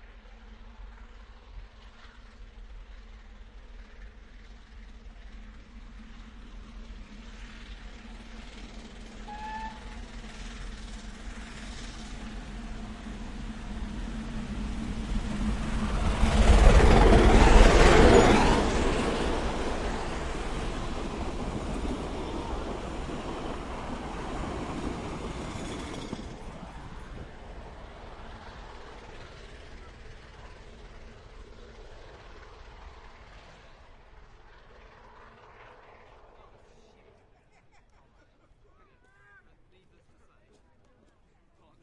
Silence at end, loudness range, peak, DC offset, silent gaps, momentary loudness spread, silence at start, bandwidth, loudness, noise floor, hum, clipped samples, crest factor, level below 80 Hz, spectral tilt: 7.9 s; 29 LU; -4 dBFS; under 0.1%; none; 30 LU; 0 s; 11.5 kHz; -27 LUFS; -63 dBFS; none; under 0.1%; 26 dB; -32 dBFS; -5.5 dB/octave